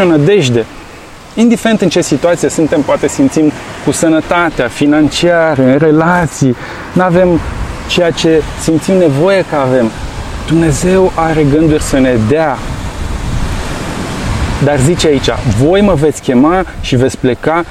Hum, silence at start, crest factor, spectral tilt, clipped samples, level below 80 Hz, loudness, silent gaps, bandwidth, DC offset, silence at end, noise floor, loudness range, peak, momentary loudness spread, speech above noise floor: none; 0 s; 10 dB; -5.5 dB/octave; under 0.1%; -26 dBFS; -11 LUFS; none; 15 kHz; under 0.1%; 0 s; -31 dBFS; 3 LU; 0 dBFS; 10 LU; 21 dB